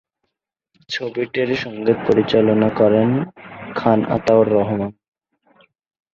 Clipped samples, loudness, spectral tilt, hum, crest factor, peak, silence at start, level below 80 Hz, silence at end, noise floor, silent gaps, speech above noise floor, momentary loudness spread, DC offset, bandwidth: under 0.1%; -18 LUFS; -7.5 dB/octave; none; 18 dB; -2 dBFS; 0.9 s; -52 dBFS; 1.25 s; -77 dBFS; none; 60 dB; 13 LU; under 0.1%; 7.4 kHz